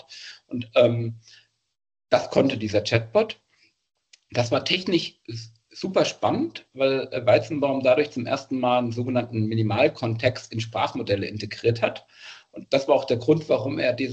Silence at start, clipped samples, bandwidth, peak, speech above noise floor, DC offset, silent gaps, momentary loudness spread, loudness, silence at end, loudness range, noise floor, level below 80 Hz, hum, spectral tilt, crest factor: 0.1 s; under 0.1%; 8.4 kHz; -4 dBFS; 21 dB; under 0.1%; none; 15 LU; -24 LUFS; 0 s; 3 LU; -44 dBFS; -62 dBFS; none; -6 dB/octave; 20 dB